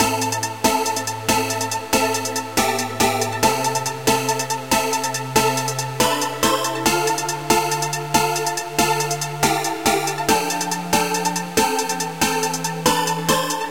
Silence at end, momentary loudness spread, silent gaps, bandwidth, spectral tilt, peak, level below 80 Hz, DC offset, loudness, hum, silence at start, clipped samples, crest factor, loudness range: 0 s; 4 LU; none; 17 kHz; -2.5 dB/octave; -2 dBFS; -48 dBFS; 0.6%; -20 LUFS; none; 0 s; under 0.1%; 20 dB; 1 LU